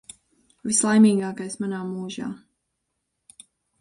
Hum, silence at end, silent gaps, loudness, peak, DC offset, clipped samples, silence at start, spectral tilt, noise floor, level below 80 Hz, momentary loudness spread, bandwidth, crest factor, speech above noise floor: none; 1.45 s; none; -22 LUFS; -6 dBFS; under 0.1%; under 0.1%; 0.65 s; -4.5 dB/octave; -78 dBFS; -68 dBFS; 18 LU; 11.5 kHz; 20 dB; 56 dB